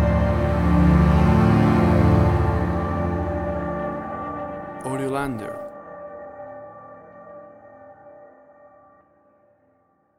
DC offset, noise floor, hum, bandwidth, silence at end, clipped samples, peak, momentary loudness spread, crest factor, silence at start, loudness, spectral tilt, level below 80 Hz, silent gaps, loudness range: under 0.1%; -63 dBFS; none; 12 kHz; 1.95 s; under 0.1%; -6 dBFS; 22 LU; 16 dB; 0 s; -21 LUFS; -8.5 dB/octave; -30 dBFS; none; 23 LU